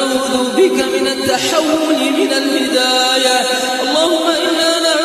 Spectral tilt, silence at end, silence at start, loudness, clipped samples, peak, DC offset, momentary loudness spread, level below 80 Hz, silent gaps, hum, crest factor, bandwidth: -1.5 dB/octave; 0 s; 0 s; -13 LUFS; under 0.1%; 0 dBFS; under 0.1%; 4 LU; -56 dBFS; none; none; 14 dB; 14 kHz